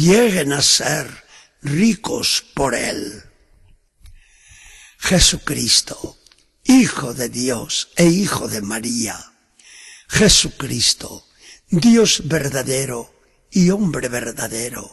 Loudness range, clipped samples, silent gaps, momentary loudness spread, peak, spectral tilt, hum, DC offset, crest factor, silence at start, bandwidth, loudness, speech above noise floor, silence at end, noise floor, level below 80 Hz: 5 LU; under 0.1%; none; 12 LU; 0 dBFS; -3.5 dB/octave; none; under 0.1%; 18 dB; 0 s; 12.5 kHz; -17 LUFS; 35 dB; 0 s; -52 dBFS; -38 dBFS